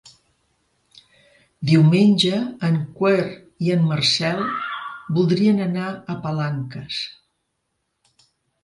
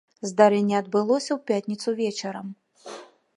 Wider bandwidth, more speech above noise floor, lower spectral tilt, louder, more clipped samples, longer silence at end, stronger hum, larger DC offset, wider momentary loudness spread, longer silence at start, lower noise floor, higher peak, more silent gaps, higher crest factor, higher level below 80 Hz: about the same, 11.5 kHz vs 11 kHz; first, 55 dB vs 20 dB; about the same, -6 dB/octave vs -5 dB/octave; first, -20 LUFS vs -24 LUFS; neither; first, 1.55 s vs 0.3 s; neither; neither; second, 14 LU vs 22 LU; first, 1.6 s vs 0.25 s; first, -74 dBFS vs -43 dBFS; about the same, -4 dBFS vs -4 dBFS; neither; about the same, 18 dB vs 20 dB; first, -60 dBFS vs -78 dBFS